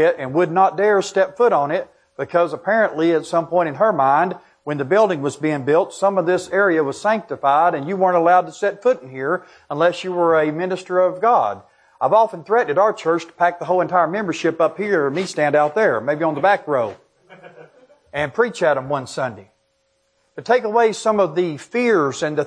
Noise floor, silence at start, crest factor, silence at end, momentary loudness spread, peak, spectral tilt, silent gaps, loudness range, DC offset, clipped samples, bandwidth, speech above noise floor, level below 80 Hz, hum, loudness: -66 dBFS; 0 s; 16 dB; 0 s; 8 LU; -2 dBFS; -5.5 dB/octave; none; 3 LU; under 0.1%; under 0.1%; 10.5 kHz; 48 dB; -66 dBFS; none; -18 LUFS